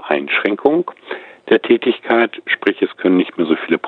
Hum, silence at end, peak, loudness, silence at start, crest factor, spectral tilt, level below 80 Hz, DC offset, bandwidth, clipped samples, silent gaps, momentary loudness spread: none; 0 s; 0 dBFS; -16 LUFS; 0 s; 16 dB; -7.5 dB/octave; -66 dBFS; under 0.1%; 4.3 kHz; under 0.1%; none; 9 LU